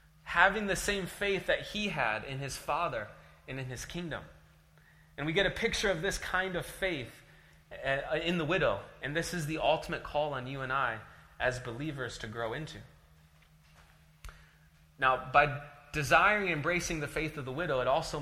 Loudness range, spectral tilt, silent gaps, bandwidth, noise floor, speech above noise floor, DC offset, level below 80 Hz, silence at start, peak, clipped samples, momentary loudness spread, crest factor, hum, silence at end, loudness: 9 LU; -4 dB/octave; none; 16 kHz; -62 dBFS; 29 dB; under 0.1%; -52 dBFS; 0.25 s; -6 dBFS; under 0.1%; 13 LU; 26 dB; none; 0 s; -32 LUFS